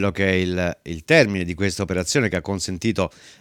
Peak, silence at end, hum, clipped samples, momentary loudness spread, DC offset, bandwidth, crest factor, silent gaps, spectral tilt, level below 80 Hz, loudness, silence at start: 0 dBFS; 0.1 s; none; under 0.1%; 10 LU; under 0.1%; 17 kHz; 20 dB; none; -5 dB/octave; -46 dBFS; -21 LUFS; 0 s